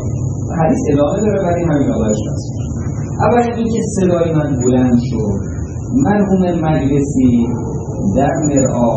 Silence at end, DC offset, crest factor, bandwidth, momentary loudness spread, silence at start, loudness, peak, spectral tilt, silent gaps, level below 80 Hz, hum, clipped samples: 0 s; under 0.1%; 14 dB; 8.8 kHz; 8 LU; 0 s; -15 LUFS; 0 dBFS; -7.5 dB/octave; none; -32 dBFS; none; under 0.1%